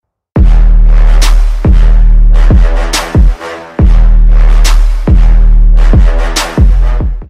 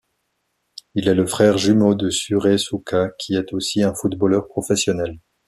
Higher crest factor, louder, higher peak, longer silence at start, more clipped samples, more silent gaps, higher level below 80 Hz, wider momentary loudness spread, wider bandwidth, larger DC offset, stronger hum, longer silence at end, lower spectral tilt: second, 4 dB vs 16 dB; first, -10 LUFS vs -19 LUFS; first, 0 dBFS vs -4 dBFS; second, 0.35 s vs 0.95 s; first, 0.1% vs under 0.1%; neither; first, -4 dBFS vs -54 dBFS; second, 4 LU vs 7 LU; second, 11 kHz vs 14.5 kHz; neither; neither; second, 0.05 s vs 0.3 s; about the same, -5.5 dB/octave vs -5 dB/octave